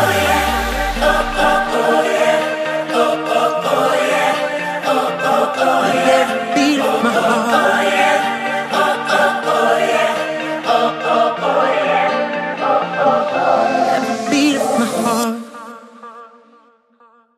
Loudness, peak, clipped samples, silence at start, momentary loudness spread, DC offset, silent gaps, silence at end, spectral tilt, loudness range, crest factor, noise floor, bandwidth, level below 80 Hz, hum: -15 LUFS; 0 dBFS; under 0.1%; 0 s; 5 LU; under 0.1%; none; 1.1 s; -3.5 dB/octave; 2 LU; 16 dB; -51 dBFS; 15.5 kHz; -38 dBFS; none